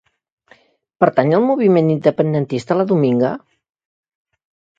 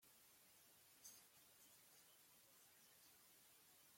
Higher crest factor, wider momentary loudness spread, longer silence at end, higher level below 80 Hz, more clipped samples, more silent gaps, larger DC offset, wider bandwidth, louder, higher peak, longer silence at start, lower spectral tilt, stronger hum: about the same, 18 dB vs 22 dB; about the same, 6 LU vs 6 LU; first, 1.4 s vs 0 s; first, -62 dBFS vs under -90 dBFS; neither; neither; neither; second, 7.8 kHz vs 16.5 kHz; first, -16 LUFS vs -67 LUFS; first, 0 dBFS vs -48 dBFS; first, 1 s vs 0 s; first, -8.5 dB/octave vs -0.5 dB/octave; neither